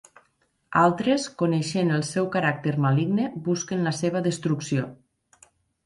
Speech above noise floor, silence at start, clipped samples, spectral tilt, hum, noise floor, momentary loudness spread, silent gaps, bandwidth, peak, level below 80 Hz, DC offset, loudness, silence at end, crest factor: 45 dB; 0.7 s; under 0.1%; -6 dB/octave; none; -69 dBFS; 6 LU; none; 11.5 kHz; -6 dBFS; -64 dBFS; under 0.1%; -24 LUFS; 0.9 s; 20 dB